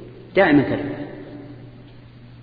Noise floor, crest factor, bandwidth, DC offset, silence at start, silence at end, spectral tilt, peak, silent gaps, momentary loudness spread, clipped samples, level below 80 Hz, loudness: -43 dBFS; 20 dB; 5 kHz; under 0.1%; 0 s; 0 s; -10 dB/octave; -2 dBFS; none; 24 LU; under 0.1%; -50 dBFS; -19 LUFS